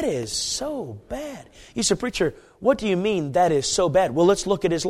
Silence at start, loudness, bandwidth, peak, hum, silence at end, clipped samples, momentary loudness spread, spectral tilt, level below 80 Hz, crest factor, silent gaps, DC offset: 0 s; -22 LUFS; 15.5 kHz; -6 dBFS; none; 0 s; under 0.1%; 14 LU; -4 dB/octave; -48 dBFS; 16 dB; none; under 0.1%